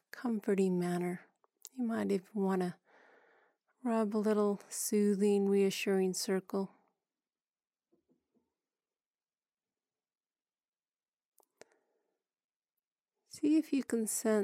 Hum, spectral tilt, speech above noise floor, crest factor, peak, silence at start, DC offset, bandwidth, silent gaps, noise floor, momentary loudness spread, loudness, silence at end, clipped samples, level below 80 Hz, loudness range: none; -5.5 dB/octave; over 58 dB; 16 dB; -20 dBFS; 0.15 s; under 0.1%; 16 kHz; 10.17-10.21 s, 10.68-10.73 s, 11.08-11.13 s, 11.25-11.32 s, 12.44-12.49 s, 12.56-12.60 s, 12.87-12.91 s; under -90 dBFS; 10 LU; -33 LUFS; 0 s; under 0.1%; under -90 dBFS; 8 LU